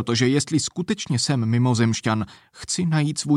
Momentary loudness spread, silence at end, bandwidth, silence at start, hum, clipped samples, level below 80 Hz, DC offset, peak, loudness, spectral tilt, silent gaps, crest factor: 7 LU; 0 s; 12 kHz; 0 s; none; under 0.1%; -56 dBFS; under 0.1%; -8 dBFS; -22 LUFS; -5 dB/octave; none; 14 dB